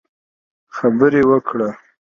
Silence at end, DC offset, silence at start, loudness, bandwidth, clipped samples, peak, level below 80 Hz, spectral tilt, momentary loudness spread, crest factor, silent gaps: 0.4 s; under 0.1%; 0.75 s; -16 LUFS; 7 kHz; under 0.1%; 0 dBFS; -56 dBFS; -8.5 dB/octave; 11 LU; 18 dB; none